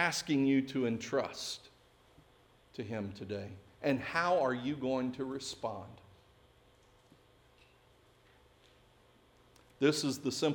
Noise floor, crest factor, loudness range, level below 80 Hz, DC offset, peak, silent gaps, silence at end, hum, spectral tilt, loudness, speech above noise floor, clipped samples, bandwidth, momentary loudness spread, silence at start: -65 dBFS; 22 dB; 10 LU; -70 dBFS; under 0.1%; -16 dBFS; none; 0 s; none; -4.5 dB/octave; -35 LUFS; 31 dB; under 0.1%; 18 kHz; 13 LU; 0 s